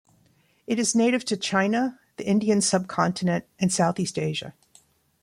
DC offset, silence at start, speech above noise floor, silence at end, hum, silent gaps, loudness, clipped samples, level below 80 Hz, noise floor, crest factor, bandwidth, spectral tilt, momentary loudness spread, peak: under 0.1%; 0.7 s; 39 dB; 0.75 s; none; none; -24 LUFS; under 0.1%; -64 dBFS; -63 dBFS; 18 dB; 15.5 kHz; -4.5 dB/octave; 8 LU; -8 dBFS